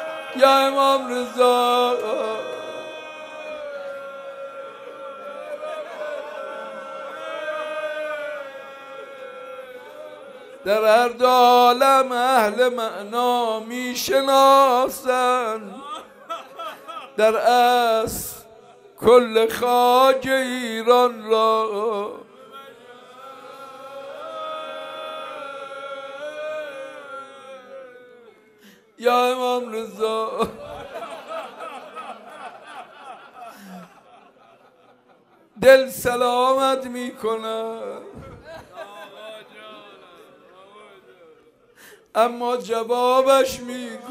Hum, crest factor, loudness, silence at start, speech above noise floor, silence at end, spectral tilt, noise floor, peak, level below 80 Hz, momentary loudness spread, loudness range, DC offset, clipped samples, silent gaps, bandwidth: none; 22 dB; -20 LUFS; 0 s; 37 dB; 0 s; -3 dB/octave; -56 dBFS; 0 dBFS; -60 dBFS; 24 LU; 17 LU; under 0.1%; under 0.1%; none; 15.5 kHz